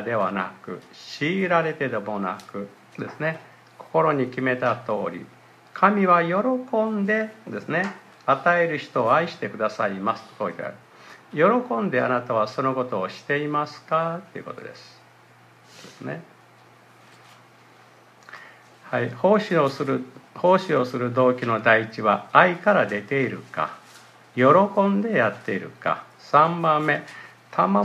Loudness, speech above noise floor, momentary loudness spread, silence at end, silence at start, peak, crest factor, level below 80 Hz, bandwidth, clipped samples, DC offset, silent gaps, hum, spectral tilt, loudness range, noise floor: -23 LUFS; 30 dB; 18 LU; 0 s; 0 s; 0 dBFS; 24 dB; -74 dBFS; 13 kHz; under 0.1%; under 0.1%; none; none; -7 dB/octave; 12 LU; -53 dBFS